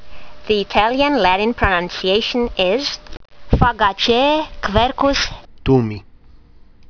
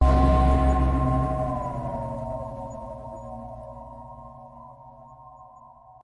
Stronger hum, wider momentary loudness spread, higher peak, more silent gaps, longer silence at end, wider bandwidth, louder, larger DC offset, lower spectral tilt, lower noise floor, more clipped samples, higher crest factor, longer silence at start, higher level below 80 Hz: neither; second, 8 LU vs 27 LU; first, 0 dBFS vs -6 dBFS; neither; about the same, 0.25 s vs 0.35 s; second, 5.4 kHz vs 10 kHz; first, -17 LUFS vs -25 LUFS; neither; second, -5 dB/octave vs -9 dB/octave; second, -43 dBFS vs -50 dBFS; neither; about the same, 18 dB vs 18 dB; about the same, 0 s vs 0 s; about the same, -30 dBFS vs -28 dBFS